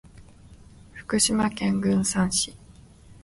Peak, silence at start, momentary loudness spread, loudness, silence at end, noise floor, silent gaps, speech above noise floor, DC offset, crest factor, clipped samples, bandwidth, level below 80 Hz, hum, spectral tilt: -8 dBFS; 0.15 s; 12 LU; -24 LUFS; 0.1 s; -50 dBFS; none; 26 dB; under 0.1%; 18 dB; under 0.1%; 11.5 kHz; -50 dBFS; none; -3.5 dB/octave